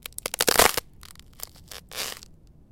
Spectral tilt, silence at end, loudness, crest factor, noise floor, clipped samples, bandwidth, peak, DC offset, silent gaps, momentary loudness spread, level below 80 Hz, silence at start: -1 dB/octave; 0.45 s; -23 LUFS; 28 dB; -50 dBFS; under 0.1%; 17 kHz; 0 dBFS; under 0.1%; none; 23 LU; -48 dBFS; 0.25 s